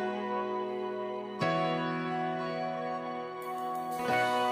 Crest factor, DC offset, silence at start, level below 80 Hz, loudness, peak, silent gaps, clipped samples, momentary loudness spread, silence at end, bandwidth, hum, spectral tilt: 16 dB; under 0.1%; 0 s; -76 dBFS; -33 LUFS; -16 dBFS; none; under 0.1%; 8 LU; 0 s; 15.5 kHz; none; -5.5 dB/octave